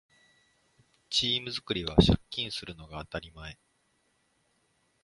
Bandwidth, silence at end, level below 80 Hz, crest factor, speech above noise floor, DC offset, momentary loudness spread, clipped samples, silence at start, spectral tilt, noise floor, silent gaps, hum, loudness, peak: 11.5 kHz; 1.5 s; -44 dBFS; 28 dB; 43 dB; under 0.1%; 20 LU; under 0.1%; 1.1 s; -5 dB/octave; -73 dBFS; none; none; -29 LUFS; -4 dBFS